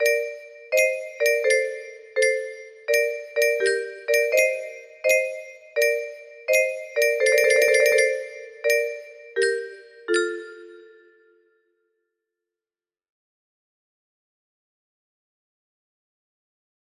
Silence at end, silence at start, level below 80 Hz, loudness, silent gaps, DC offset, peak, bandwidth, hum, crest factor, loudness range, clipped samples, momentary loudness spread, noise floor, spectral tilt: 6.05 s; 0 s; -74 dBFS; -22 LUFS; none; under 0.1%; -4 dBFS; 13.5 kHz; none; 20 dB; 9 LU; under 0.1%; 18 LU; under -90 dBFS; 0 dB/octave